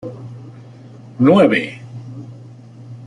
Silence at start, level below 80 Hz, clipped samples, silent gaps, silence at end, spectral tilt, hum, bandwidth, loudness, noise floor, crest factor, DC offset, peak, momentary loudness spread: 0.05 s; -60 dBFS; under 0.1%; none; 0 s; -8 dB/octave; none; 10.5 kHz; -14 LUFS; -39 dBFS; 18 dB; under 0.1%; -2 dBFS; 26 LU